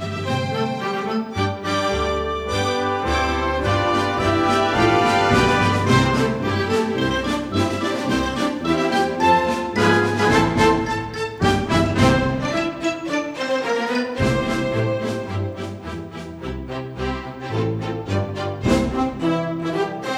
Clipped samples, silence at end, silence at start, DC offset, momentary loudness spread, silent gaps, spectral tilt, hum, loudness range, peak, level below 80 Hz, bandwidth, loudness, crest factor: under 0.1%; 0 s; 0 s; under 0.1%; 10 LU; none; -5.5 dB/octave; none; 7 LU; -2 dBFS; -38 dBFS; 15.5 kHz; -20 LUFS; 18 dB